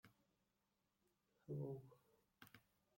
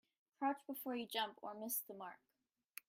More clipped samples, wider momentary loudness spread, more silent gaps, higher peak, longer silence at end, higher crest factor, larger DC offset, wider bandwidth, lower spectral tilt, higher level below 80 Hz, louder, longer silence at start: neither; first, 16 LU vs 11 LU; neither; second, -40 dBFS vs -28 dBFS; second, 0.4 s vs 0.75 s; about the same, 20 dB vs 18 dB; neither; about the same, 16.5 kHz vs 16.5 kHz; first, -8.5 dB/octave vs -2 dB/octave; about the same, -88 dBFS vs under -90 dBFS; second, -53 LUFS vs -44 LUFS; second, 0.05 s vs 0.4 s